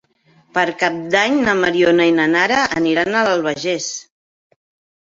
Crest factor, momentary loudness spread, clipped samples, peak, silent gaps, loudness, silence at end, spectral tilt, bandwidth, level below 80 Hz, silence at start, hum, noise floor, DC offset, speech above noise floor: 16 dB; 8 LU; under 0.1%; 0 dBFS; none; -16 LUFS; 1 s; -4 dB/octave; 7.8 kHz; -56 dBFS; 0.55 s; none; -55 dBFS; under 0.1%; 39 dB